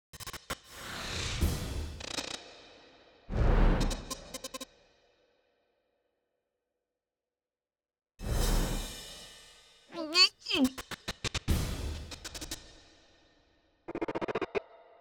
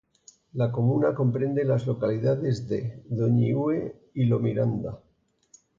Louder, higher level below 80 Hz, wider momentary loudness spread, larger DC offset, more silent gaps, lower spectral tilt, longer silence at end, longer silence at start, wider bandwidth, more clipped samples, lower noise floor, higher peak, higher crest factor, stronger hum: second, -33 LUFS vs -26 LUFS; first, -38 dBFS vs -58 dBFS; first, 16 LU vs 9 LU; neither; neither; second, -4 dB/octave vs -9.5 dB/octave; second, 0.25 s vs 0.8 s; second, 0.15 s vs 0.55 s; first, 20 kHz vs 7.4 kHz; neither; first, under -90 dBFS vs -60 dBFS; about the same, -12 dBFS vs -12 dBFS; first, 22 dB vs 14 dB; neither